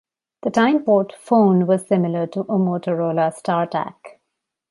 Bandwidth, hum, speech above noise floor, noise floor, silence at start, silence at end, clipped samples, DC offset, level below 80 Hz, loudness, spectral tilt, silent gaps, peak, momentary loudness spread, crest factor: 11.5 kHz; none; 60 dB; -78 dBFS; 0.45 s; 0.65 s; under 0.1%; under 0.1%; -68 dBFS; -19 LUFS; -7.5 dB/octave; none; -4 dBFS; 8 LU; 16 dB